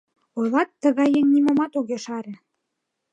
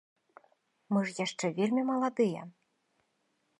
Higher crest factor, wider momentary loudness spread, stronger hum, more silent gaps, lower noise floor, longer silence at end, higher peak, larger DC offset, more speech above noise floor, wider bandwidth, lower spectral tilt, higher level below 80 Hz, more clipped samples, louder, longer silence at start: about the same, 16 dB vs 18 dB; first, 15 LU vs 7 LU; neither; neither; about the same, -79 dBFS vs -77 dBFS; second, 0.75 s vs 1.1 s; first, -6 dBFS vs -16 dBFS; neither; first, 59 dB vs 46 dB; second, 8.6 kHz vs 11 kHz; about the same, -5.5 dB/octave vs -5.5 dB/octave; first, -74 dBFS vs -86 dBFS; neither; first, -21 LUFS vs -31 LUFS; second, 0.35 s vs 0.9 s